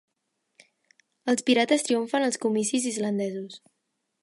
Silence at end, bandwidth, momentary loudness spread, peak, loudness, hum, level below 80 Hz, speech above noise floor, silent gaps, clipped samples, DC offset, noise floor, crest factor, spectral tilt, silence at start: 0.65 s; 11.5 kHz; 12 LU; -10 dBFS; -25 LUFS; none; -80 dBFS; 53 dB; none; under 0.1%; under 0.1%; -79 dBFS; 18 dB; -3.5 dB/octave; 1.25 s